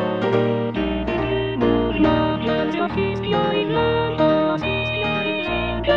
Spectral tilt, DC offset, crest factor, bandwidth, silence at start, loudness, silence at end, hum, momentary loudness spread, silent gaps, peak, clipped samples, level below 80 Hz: -8 dB/octave; 0.3%; 14 dB; 7 kHz; 0 s; -20 LUFS; 0 s; none; 5 LU; none; -6 dBFS; under 0.1%; -36 dBFS